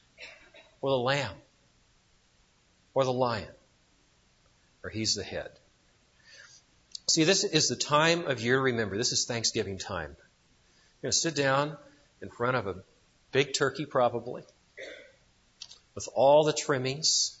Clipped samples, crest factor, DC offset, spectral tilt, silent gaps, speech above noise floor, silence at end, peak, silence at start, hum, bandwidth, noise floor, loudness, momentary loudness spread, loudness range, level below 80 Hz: under 0.1%; 22 dB; under 0.1%; -3 dB/octave; none; 38 dB; 0.05 s; -10 dBFS; 0.2 s; none; 8 kHz; -66 dBFS; -28 LUFS; 22 LU; 9 LU; -64 dBFS